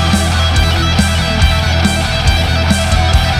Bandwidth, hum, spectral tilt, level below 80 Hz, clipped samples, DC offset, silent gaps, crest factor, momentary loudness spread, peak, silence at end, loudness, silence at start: 15 kHz; none; -4.5 dB/octave; -16 dBFS; under 0.1%; under 0.1%; none; 12 dB; 1 LU; 0 dBFS; 0 s; -12 LUFS; 0 s